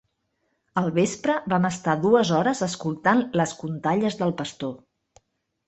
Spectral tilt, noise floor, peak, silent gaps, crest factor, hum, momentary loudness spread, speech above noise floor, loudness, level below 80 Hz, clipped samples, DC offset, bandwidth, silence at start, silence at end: -5.5 dB/octave; -74 dBFS; -6 dBFS; none; 18 dB; none; 10 LU; 51 dB; -24 LUFS; -64 dBFS; under 0.1%; under 0.1%; 8.4 kHz; 0.75 s; 0.9 s